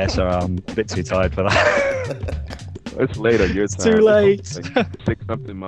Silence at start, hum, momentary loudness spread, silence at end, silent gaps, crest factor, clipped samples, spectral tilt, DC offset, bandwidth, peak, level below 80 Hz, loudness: 0 s; none; 14 LU; 0 s; none; 16 dB; under 0.1%; -5.5 dB/octave; under 0.1%; 10 kHz; -4 dBFS; -34 dBFS; -19 LUFS